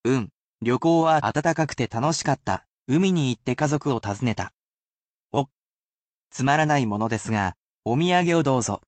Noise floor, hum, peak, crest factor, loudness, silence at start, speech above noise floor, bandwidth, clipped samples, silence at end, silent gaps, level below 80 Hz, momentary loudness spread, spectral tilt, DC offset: under -90 dBFS; none; -8 dBFS; 16 dB; -23 LUFS; 0.05 s; over 68 dB; 9 kHz; under 0.1%; 0.1 s; 0.33-0.56 s, 2.70-2.86 s, 4.54-5.29 s, 5.57-6.30 s, 7.56-7.81 s; -56 dBFS; 10 LU; -5.5 dB/octave; under 0.1%